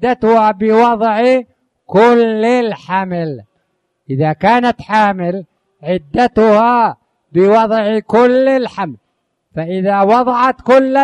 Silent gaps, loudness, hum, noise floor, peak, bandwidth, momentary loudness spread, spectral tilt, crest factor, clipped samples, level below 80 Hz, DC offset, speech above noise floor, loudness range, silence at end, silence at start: none; -12 LUFS; none; -66 dBFS; 0 dBFS; 9.8 kHz; 11 LU; -7 dB/octave; 12 dB; under 0.1%; -50 dBFS; under 0.1%; 54 dB; 3 LU; 0 s; 0 s